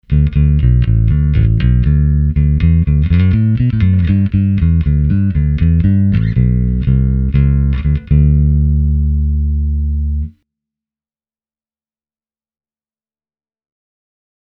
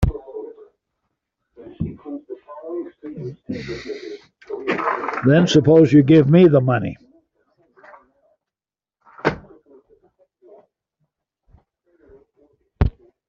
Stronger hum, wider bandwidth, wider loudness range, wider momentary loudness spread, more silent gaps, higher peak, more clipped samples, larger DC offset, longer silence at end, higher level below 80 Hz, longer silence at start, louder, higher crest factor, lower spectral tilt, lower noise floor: neither; second, 4.1 kHz vs 7.4 kHz; second, 8 LU vs 17 LU; second, 4 LU vs 23 LU; neither; about the same, 0 dBFS vs -2 dBFS; neither; neither; first, 4.15 s vs 0.4 s; first, -16 dBFS vs -38 dBFS; about the same, 0.1 s vs 0 s; first, -13 LUFS vs -17 LUFS; second, 12 dB vs 18 dB; first, -11.5 dB/octave vs -7 dB/octave; about the same, under -90 dBFS vs under -90 dBFS